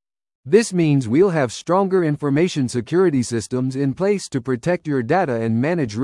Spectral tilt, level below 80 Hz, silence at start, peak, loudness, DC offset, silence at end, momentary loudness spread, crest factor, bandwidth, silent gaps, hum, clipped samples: -6.5 dB/octave; -56 dBFS; 0.45 s; -2 dBFS; -19 LUFS; under 0.1%; 0 s; 6 LU; 16 dB; 12 kHz; none; none; under 0.1%